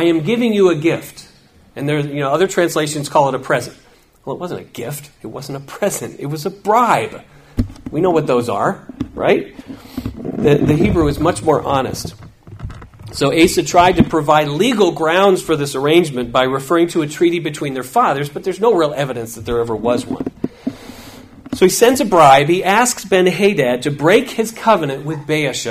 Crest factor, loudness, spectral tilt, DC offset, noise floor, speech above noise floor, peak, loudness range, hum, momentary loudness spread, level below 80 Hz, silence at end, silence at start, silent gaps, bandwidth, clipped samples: 16 dB; -15 LUFS; -5 dB/octave; under 0.1%; -47 dBFS; 32 dB; 0 dBFS; 7 LU; none; 16 LU; -40 dBFS; 0 s; 0 s; none; 16 kHz; under 0.1%